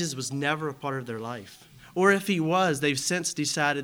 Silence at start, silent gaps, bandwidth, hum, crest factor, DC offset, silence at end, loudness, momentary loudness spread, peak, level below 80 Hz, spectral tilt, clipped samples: 0 s; none; over 20 kHz; none; 20 dB; under 0.1%; 0 s; -26 LUFS; 13 LU; -8 dBFS; -66 dBFS; -4 dB/octave; under 0.1%